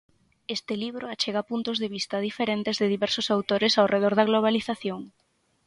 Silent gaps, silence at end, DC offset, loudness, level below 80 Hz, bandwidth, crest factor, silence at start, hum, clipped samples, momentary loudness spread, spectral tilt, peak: none; 0.6 s; under 0.1%; -26 LUFS; -68 dBFS; 11.5 kHz; 18 dB; 0.5 s; none; under 0.1%; 12 LU; -4.5 dB/octave; -8 dBFS